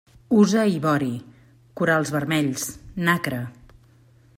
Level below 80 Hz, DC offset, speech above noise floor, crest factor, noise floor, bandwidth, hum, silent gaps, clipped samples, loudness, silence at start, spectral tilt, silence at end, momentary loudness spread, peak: -56 dBFS; under 0.1%; 33 dB; 18 dB; -54 dBFS; 16 kHz; none; none; under 0.1%; -22 LUFS; 0.3 s; -5.5 dB/octave; 0.85 s; 12 LU; -4 dBFS